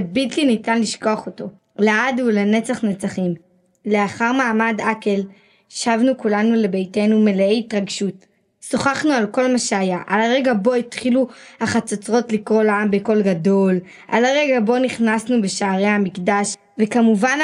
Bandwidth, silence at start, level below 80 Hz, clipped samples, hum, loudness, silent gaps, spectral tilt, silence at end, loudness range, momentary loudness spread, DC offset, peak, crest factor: 11 kHz; 0 s; -64 dBFS; under 0.1%; none; -18 LUFS; none; -5 dB/octave; 0 s; 2 LU; 8 LU; under 0.1%; -2 dBFS; 16 dB